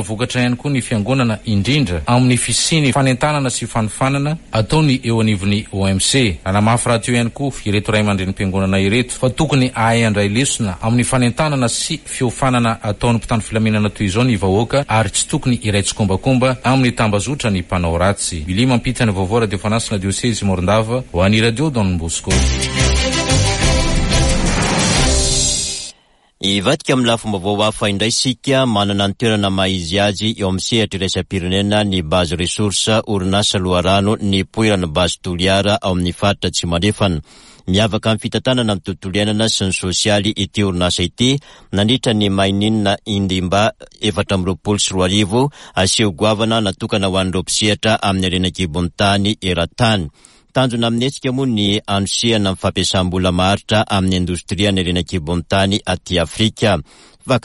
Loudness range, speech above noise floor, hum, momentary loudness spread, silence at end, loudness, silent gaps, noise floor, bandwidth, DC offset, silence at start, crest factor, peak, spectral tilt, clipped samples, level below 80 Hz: 2 LU; 38 dB; none; 5 LU; 0.05 s; -16 LUFS; none; -53 dBFS; 11.5 kHz; under 0.1%; 0 s; 14 dB; -2 dBFS; -4.5 dB/octave; under 0.1%; -30 dBFS